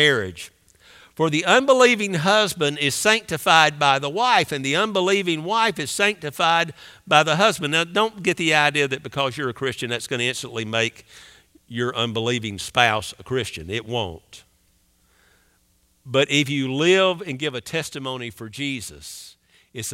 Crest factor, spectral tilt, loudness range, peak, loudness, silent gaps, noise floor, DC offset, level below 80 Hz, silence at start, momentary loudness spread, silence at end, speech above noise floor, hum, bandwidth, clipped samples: 22 dB; -3.5 dB/octave; 8 LU; 0 dBFS; -20 LUFS; none; -63 dBFS; under 0.1%; -58 dBFS; 0 s; 13 LU; 0 s; 41 dB; none; 16 kHz; under 0.1%